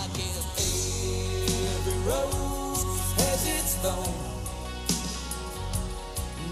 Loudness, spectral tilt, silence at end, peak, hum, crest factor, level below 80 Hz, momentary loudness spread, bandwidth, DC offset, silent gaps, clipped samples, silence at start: -29 LUFS; -3.5 dB/octave; 0 s; -10 dBFS; none; 20 dB; -36 dBFS; 9 LU; 16 kHz; under 0.1%; none; under 0.1%; 0 s